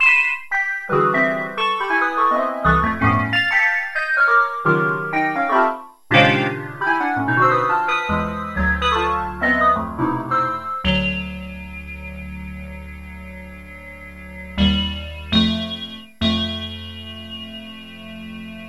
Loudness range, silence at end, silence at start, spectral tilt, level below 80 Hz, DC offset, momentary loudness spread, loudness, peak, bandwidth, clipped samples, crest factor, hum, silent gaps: 9 LU; 0 s; 0 s; -6 dB/octave; -36 dBFS; 0.4%; 19 LU; -18 LUFS; 0 dBFS; 12.5 kHz; under 0.1%; 20 dB; none; none